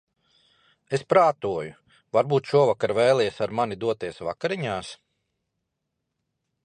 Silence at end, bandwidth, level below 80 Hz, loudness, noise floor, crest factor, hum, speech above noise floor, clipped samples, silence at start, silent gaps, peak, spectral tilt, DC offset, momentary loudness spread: 1.7 s; 10.5 kHz; -62 dBFS; -24 LUFS; -80 dBFS; 20 dB; none; 57 dB; under 0.1%; 0.9 s; none; -6 dBFS; -6 dB/octave; under 0.1%; 12 LU